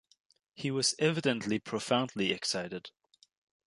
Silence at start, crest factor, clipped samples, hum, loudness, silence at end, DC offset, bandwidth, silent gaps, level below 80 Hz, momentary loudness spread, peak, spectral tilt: 0.55 s; 20 dB; under 0.1%; none; -31 LUFS; 0.75 s; under 0.1%; 11.5 kHz; none; -72 dBFS; 12 LU; -12 dBFS; -3.5 dB/octave